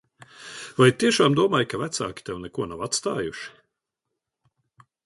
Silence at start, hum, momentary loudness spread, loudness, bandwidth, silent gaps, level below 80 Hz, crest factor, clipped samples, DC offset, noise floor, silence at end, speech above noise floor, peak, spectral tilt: 0.4 s; none; 19 LU; -23 LUFS; 11.5 kHz; none; -58 dBFS; 22 dB; under 0.1%; under 0.1%; -83 dBFS; 1.55 s; 60 dB; -4 dBFS; -4.5 dB/octave